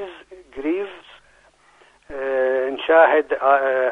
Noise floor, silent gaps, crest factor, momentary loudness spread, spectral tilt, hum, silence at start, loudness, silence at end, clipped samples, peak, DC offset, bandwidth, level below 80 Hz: -55 dBFS; none; 20 dB; 20 LU; -5 dB/octave; none; 0 s; -19 LUFS; 0 s; under 0.1%; -2 dBFS; under 0.1%; 4.8 kHz; -58 dBFS